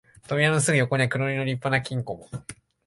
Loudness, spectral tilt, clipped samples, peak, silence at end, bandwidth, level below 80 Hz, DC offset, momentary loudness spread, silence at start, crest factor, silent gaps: -24 LUFS; -5 dB/octave; under 0.1%; -8 dBFS; 0.35 s; 11.5 kHz; -58 dBFS; under 0.1%; 17 LU; 0.3 s; 18 dB; none